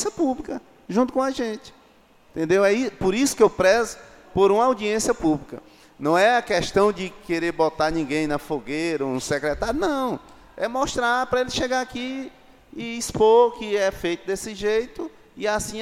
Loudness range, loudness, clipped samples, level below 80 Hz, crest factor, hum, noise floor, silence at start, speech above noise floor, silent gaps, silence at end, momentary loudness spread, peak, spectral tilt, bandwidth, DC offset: 4 LU; -22 LUFS; under 0.1%; -48 dBFS; 18 dB; none; -55 dBFS; 0 s; 32 dB; none; 0 s; 15 LU; -4 dBFS; -4 dB/octave; 16 kHz; under 0.1%